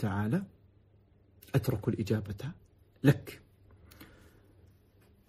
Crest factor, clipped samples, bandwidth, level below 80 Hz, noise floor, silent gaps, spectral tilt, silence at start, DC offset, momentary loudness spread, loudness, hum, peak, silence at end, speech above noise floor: 26 dB; under 0.1%; 15 kHz; -60 dBFS; -63 dBFS; none; -7.5 dB/octave; 0 s; under 0.1%; 26 LU; -32 LUFS; none; -8 dBFS; 1.25 s; 33 dB